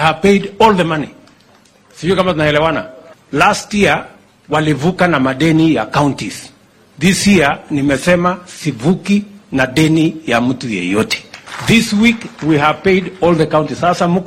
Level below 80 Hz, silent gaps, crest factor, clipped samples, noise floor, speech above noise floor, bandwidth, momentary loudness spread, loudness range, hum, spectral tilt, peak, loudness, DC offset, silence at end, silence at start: -42 dBFS; none; 14 dB; under 0.1%; -48 dBFS; 35 dB; 16 kHz; 10 LU; 2 LU; none; -5.5 dB/octave; 0 dBFS; -14 LUFS; under 0.1%; 0 s; 0 s